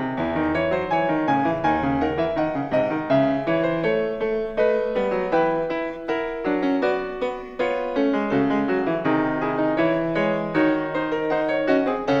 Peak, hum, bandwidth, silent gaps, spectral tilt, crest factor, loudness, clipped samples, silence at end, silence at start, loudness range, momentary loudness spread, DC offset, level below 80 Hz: -6 dBFS; none; 7.6 kHz; none; -7.5 dB/octave; 16 dB; -22 LUFS; under 0.1%; 0 s; 0 s; 2 LU; 4 LU; under 0.1%; -48 dBFS